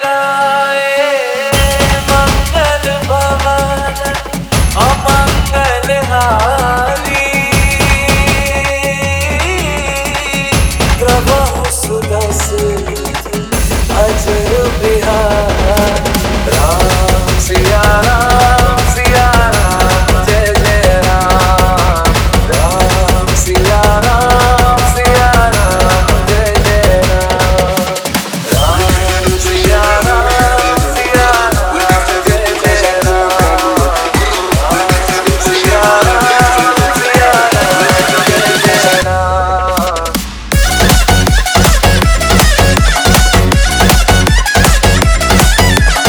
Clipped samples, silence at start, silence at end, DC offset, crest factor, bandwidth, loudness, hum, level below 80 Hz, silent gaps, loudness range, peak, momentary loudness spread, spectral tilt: 0.5%; 0 s; 0 s; under 0.1%; 10 dB; over 20 kHz; -10 LUFS; none; -16 dBFS; none; 4 LU; 0 dBFS; 5 LU; -4 dB/octave